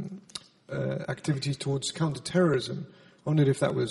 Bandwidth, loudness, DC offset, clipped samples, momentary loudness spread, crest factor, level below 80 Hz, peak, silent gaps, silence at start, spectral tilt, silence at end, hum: 11.5 kHz; -29 LUFS; under 0.1%; under 0.1%; 15 LU; 18 dB; -64 dBFS; -12 dBFS; none; 0 s; -6 dB/octave; 0 s; none